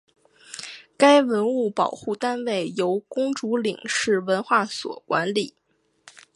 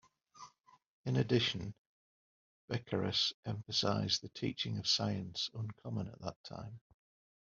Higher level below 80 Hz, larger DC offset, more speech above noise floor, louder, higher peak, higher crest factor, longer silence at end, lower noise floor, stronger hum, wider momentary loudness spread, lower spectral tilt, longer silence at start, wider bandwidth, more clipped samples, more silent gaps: about the same, -72 dBFS vs -70 dBFS; neither; first, 32 dB vs 22 dB; first, -23 LUFS vs -36 LUFS; first, -2 dBFS vs -16 dBFS; about the same, 22 dB vs 22 dB; first, 0.85 s vs 0.7 s; second, -54 dBFS vs -59 dBFS; neither; about the same, 16 LU vs 16 LU; about the same, -4 dB/octave vs -4 dB/octave; first, 0.5 s vs 0.35 s; first, 11.5 kHz vs 7.4 kHz; neither; second, none vs 0.60-0.64 s, 0.87-1.04 s, 1.78-2.68 s, 3.34-3.43 s, 6.36-6.44 s